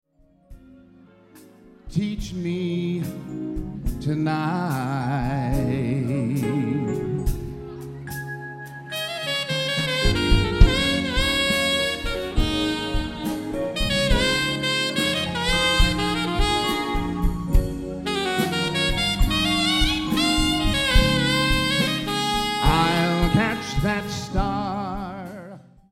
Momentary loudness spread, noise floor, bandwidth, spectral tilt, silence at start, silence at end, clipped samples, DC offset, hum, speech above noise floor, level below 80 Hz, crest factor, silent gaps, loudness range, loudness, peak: 12 LU; -51 dBFS; 16 kHz; -4.5 dB/octave; 0.5 s; 0.35 s; under 0.1%; under 0.1%; none; 27 dB; -28 dBFS; 22 dB; none; 7 LU; -23 LUFS; 0 dBFS